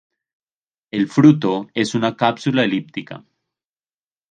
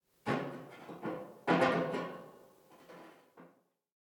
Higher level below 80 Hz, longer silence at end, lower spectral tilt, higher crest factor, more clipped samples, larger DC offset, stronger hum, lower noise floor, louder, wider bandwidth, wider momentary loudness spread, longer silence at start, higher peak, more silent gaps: first, -64 dBFS vs -76 dBFS; first, 1.15 s vs 0.55 s; about the same, -6.5 dB/octave vs -6.5 dB/octave; about the same, 20 dB vs 22 dB; neither; neither; neither; first, under -90 dBFS vs -67 dBFS; first, -18 LUFS vs -35 LUFS; second, 9.4 kHz vs 20 kHz; second, 18 LU vs 26 LU; first, 0.95 s vs 0.25 s; first, 0 dBFS vs -16 dBFS; neither